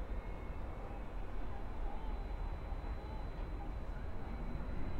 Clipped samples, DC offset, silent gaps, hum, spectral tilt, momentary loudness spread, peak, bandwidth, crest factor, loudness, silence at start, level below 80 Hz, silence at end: under 0.1%; under 0.1%; none; none; -8 dB/octave; 2 LU; -28 dBFS; 5.6 kHz; 12 dB; -47 LUFS; 0 s; -42 dBFS; 0 s